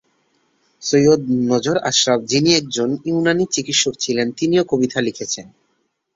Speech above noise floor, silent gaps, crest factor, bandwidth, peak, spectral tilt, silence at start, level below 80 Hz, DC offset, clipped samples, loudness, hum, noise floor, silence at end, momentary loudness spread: 51 dB; none; 18 dB; 8 kHz; -2 dBFS; -3.5 dB/octave; 0.8 s; -58 dBFS; under 0.1%; under 0.1%; -17 LUFS; none; -68 dBFS; 0.7 s; 7 LU